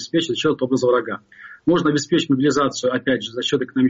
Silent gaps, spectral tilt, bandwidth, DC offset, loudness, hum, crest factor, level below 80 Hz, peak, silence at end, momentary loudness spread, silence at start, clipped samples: none; -4 dB/octave; 7.8 kHz; under 0.1%; -20 LUFS; none; 12 dB; -58 dBFS; -8 dBFS; 0 s; 4 LU; 0 s; under 0.1%